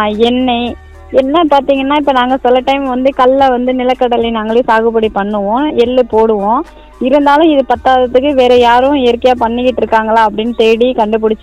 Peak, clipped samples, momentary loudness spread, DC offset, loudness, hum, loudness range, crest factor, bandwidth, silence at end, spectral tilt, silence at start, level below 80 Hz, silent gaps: 0 dBFS; 1%; 5 LU; 0.1%; -10 LUFS; none; 2 LU; 10 dB; 9.4 kHz; 0.05 s; -6 dB/octave; 0 s; -36 dBFS; none